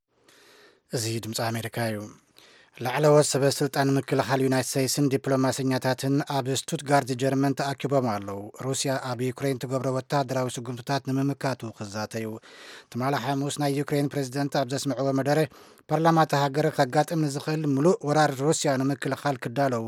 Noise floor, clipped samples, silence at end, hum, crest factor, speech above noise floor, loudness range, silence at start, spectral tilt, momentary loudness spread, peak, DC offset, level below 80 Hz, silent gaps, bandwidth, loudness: -58 dBFS; under 0.1%; 0 s; none; 18 dB; 33 dB; 6 LU; 0.9 s; -5 dB/octave; 10 LU; -8 dBFS; under 0.1%; -72 dBFS; none; 17 kHz; -26 LUFS